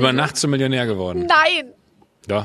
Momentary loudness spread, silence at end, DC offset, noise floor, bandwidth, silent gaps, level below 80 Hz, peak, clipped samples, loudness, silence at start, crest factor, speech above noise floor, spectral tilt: 9 LU; 0 s; under 0.1%; -41 dBFS; 13.5 kHz; none; -54 dBFS; -2 dBFS; under 0.1%; -18 LUFS; 0 s; 18 dB; 23 dB; -4 dB/octave